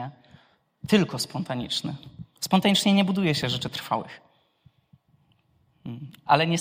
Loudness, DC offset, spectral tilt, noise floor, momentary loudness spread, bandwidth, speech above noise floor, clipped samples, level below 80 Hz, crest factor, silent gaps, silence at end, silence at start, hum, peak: -24 LUFS; under 0.1%; -5 dB/octave; -65 dBFS; 20 LU; 16 kHz; 41 dB; under 0.1%; -64 dBFS; 22 dB; none; 0 s; 0 s; none; -4 dBFS